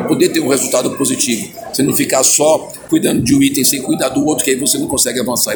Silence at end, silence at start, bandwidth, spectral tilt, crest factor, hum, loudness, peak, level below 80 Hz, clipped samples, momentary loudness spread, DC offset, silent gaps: 0 s; 0 s; 19.5 kHz; -3 dB/octave; 14 dB; none; -13 LUFS; 0 dBFS; -46 dBFS; under 0.1%; 6 LU; under 0.1%; none